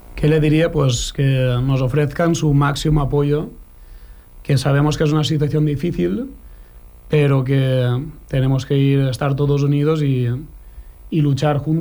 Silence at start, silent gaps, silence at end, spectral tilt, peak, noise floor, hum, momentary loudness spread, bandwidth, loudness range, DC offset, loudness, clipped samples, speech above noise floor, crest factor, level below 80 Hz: 0.05 s; none; 0 s; -7 dB/octave; -4 dBFS; -41 dBFS; 60 Hz at -45 dBFS; 7 LU; over 20 kHz; 2 LU; under 0.1%; -18 LUFS; under 0.1%; 24 dB; 12 dB; -36 dBFS